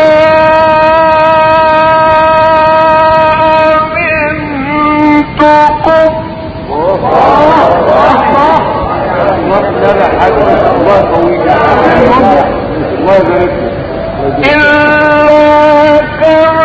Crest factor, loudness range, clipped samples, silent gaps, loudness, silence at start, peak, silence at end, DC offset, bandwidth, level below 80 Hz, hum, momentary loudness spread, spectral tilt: 6 dB; 3 LU; 3%; none; -7 LUFS; 0 s; 0 dBFS; 0 s; under 0.1%; 8 kHz; -28 dBFS; none; 7 LU; -7 dB/octave